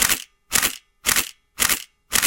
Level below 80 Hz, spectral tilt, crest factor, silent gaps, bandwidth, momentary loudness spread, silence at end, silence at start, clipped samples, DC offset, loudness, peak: -46 dBFS; 0.5 dB/octave; 24 dB; none; 18 kHz; 5 LU; 0 s; 0 s; under 0.1%; under 0.1%; -21 LUFS; 0 dBFS